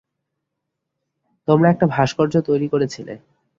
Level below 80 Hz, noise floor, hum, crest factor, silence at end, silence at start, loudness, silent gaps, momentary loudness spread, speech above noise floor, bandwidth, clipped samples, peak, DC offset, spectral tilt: -56 dBFS; -79 dBFS; none; 18 dB; 0.4 s; 1.5 s; -18 LUFS; none; 18 LU; 62 dB; 7.6 kHz; under 0.1%; -2 dBFS; under 0.1%; -7.5 dB/octave